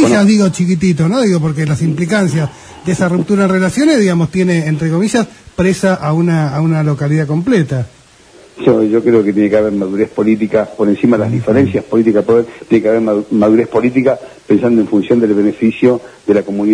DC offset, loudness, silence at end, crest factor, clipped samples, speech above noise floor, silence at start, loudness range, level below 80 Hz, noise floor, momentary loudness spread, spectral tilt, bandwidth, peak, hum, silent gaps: under 0.1%; -13 LUFS; 0 s; 12 dB; under 0.1%; 30 dB; 0 s; 2 LU; -46 dBFS; -42 dBFS; 5 LU; -7 dB/octave; 11 kHz; 0 dBFS; none; none